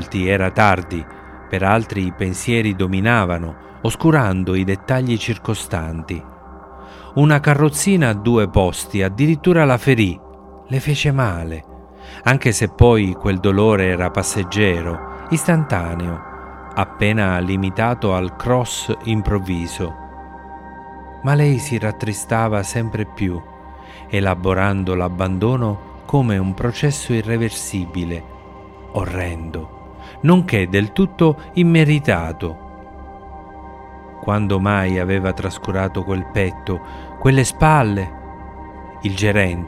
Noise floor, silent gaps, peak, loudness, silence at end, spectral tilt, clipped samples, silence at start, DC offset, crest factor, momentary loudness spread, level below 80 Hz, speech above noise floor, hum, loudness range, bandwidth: -38 dBFS; none; 0 dBFS; -18 LUFS; 0 s; -6 dB/octave; under 0.1%; 0 s; under 0.1%; 18 dB; 21 LU; -36 dBFS; 21 dB; none; 5 LU; 15.5 kHz